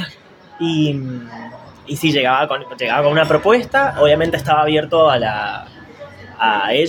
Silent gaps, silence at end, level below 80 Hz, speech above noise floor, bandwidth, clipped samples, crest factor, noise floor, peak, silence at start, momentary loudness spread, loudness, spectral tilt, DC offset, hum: none; 0 s; -48 dBFS; 26 dB; 17 kHz; under 0.1%; 16 dB; -42 dBFS; 0 dBFS; 0 s; 17 LU; -16 LUFS; -5.5 dB/octave; under 0.1%; none